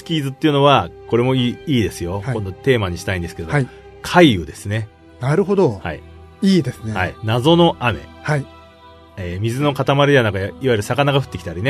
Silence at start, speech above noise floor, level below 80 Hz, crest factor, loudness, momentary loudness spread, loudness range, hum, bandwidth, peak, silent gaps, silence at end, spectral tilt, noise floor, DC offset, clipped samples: 0 s; 26 dB; -44 dBFS; 18 dB; -18 LUFS; 13 LU; 2 LU; none; 13.5 kHz; 0 dBFS; none; 0 s; -6.5 dB/octave; -44 dBFS; under 0.1%; under 0.1%